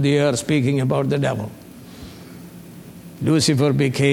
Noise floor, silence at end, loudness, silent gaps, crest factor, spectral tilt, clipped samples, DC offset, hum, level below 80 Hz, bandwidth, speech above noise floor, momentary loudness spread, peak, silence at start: -39 dBFS; 0 s; -19 LUFS; none; 16 dB; -5.5 dB/octave; under 0.1%; under 0.1%; none; -52 dBFS; 16.5 kHz; 21 dB; 23 LU; -4 dBFS; 0 s